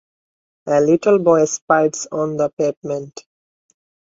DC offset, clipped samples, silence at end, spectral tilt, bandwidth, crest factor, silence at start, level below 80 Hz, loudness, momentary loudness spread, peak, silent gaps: under 0.1%; under 0.1%; 0.85 s; -5.5 dB/octave; 7.8 kHz; 16 dB; 0.65 s; -62 dBFS; -17 LUFS; 13 LU; -2 dBFS; 1.61-1.68 s, 2.53-2.57 s, 2.77-2.82 s